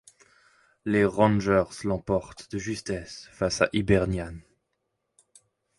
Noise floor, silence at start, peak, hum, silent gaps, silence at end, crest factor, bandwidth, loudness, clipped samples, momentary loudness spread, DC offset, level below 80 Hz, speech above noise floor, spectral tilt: -79 dBFS; 0.85 s; -6 dBFS; none; none; 1.4 s; 22 dB; 11.5 kHz; -26 LUFS; under 0.1%; 15 LU; under 0.1%; -46 dBFS; 53 dB; -6 dB/octave